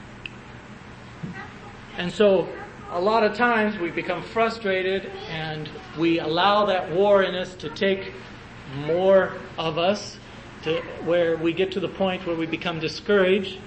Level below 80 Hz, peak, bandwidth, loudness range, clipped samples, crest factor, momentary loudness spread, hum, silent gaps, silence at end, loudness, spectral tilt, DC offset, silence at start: -52 dBFS; -6 dBFS; 8.6 kHz; 3 LU; under 0.1%; 18 dB; 19 LU; none; none; 0 s; -23 LUFS; -5.5 dB/octave; under 0.1%; 0 s